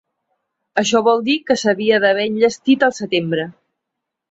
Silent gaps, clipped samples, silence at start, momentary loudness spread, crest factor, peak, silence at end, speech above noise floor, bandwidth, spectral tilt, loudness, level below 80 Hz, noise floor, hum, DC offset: none; under 0.1%; 0.75 s; 8 LU; 16 dB; -2 dBFS; 0.8 s; 64 dB; 8 kHz; -4 dB/octave; -17 LUFS; -62 dBFS; -80 dBFS; none; under 0.1%